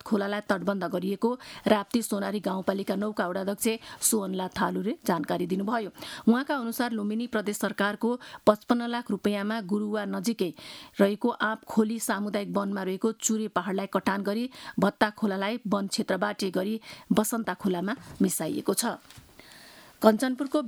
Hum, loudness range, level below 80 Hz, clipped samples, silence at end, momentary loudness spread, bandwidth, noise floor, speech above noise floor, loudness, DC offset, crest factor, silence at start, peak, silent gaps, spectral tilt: none; 1 LU; -66 dBFS; under 0.1%; 0 s; 6 LU; 19 kHz; -51 dBFS; 23 dB; -28 LUFS; under 0.1%; 24 dB; 0.05 s; -4 dBFS; none; -4.5 dB/octave